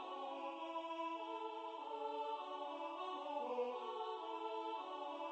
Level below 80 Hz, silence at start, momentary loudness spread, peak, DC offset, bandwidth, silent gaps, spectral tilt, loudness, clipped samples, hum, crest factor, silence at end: under -90 dBFS; 0 s; 4 LU; -32 dBFS; under 0.1%; 9 kHz; none; -2.5 dB/octave; -46 LUFS; under 0.1%; none; 14 dB; 0 s